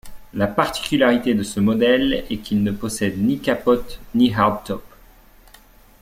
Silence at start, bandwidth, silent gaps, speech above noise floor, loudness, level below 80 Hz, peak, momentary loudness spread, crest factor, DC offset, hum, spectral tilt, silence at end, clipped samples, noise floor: 0.05 s; 16 kHz; none; 29 dB; -20 LUFS; -44 dBFS; -2 dBFS; 9 LU; 18 dB; under 0.1%; none; -5.5 dB/octave; 1.15 s; under 0.1%; -48 dBFS